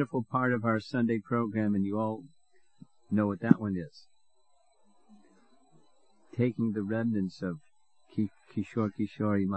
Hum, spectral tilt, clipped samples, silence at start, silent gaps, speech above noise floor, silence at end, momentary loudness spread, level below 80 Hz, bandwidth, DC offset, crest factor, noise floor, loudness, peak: none; -9 dB/octave; under 0.1%; 0 s; none; 42 dB; 0 s; 11 LU; -72 dBFS; 8.4 kHz; under 0.1%; 28 dB; -72 dBFS; -31 LUFS; -4 dBFS